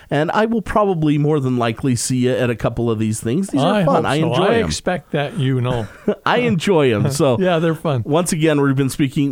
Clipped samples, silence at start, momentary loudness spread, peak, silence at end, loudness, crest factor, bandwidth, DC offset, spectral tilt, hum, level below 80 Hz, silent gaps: under 0.1%; 0.1 s; 5 LU; -2 dBFS; 0 s; -17 LUFS; 14 dB; 16.5 kHz; under 0.1%; -6 dB/octave; none; -42 dBFS; none